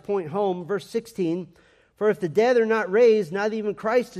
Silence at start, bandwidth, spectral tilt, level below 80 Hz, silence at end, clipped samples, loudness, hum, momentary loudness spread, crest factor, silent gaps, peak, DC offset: 0.1 s; 13 kHz; -6 dB/octave; -68 dBFS; 0 s; under 0.1%; -23 LUFS; none; 10 LU; 14 dB; none; -8 dBFS; under 0.1%